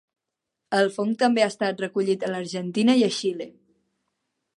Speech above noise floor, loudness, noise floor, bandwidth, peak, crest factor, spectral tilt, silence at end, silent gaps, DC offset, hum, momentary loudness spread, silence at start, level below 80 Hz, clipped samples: 61 dB; -23 LUFS; -84 dBFS; 11.5 kHz; -6 dBFS; 18 dB; -5 dB/octave; 1.1 s; none; under 0.1%; none; 9 LU; 0.7 s; -78 dBFS; under 0.1%